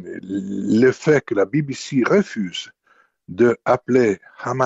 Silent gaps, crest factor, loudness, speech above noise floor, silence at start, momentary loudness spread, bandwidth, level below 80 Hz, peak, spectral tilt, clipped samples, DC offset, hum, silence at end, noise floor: none; 16 dB; -19 LUFS; 41 dB; 0 s; 11 LU; 8 kHz; -60 dBFS; -4 dBFS; -6 dB/octave; under 0.1%; under 0.1%; none; 0 s; -59 dBFS